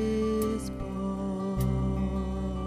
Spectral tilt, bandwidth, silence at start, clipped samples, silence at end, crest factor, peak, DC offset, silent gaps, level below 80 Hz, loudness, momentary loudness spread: -7.5 dB/octave; 15.5 kHz; 0 s; under 0.1%; 0 s; 12 dB; -16 dBFS; under 0.1%; none; -38 dBFS; -31 LUFS; 6 LU